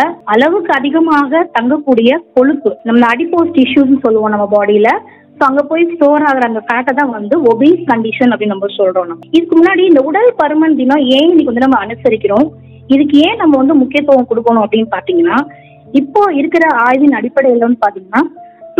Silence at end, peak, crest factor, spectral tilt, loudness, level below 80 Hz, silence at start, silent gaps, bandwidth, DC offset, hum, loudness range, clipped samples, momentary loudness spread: 0.1 s; 0 dBFS; 10 dB; -6.5 dB/octave; -10 LUFS; -54 dBFS; 0 s; none; 7.2 kHz; under 0.1%; none; 2 LU; 0.7%; 5 LU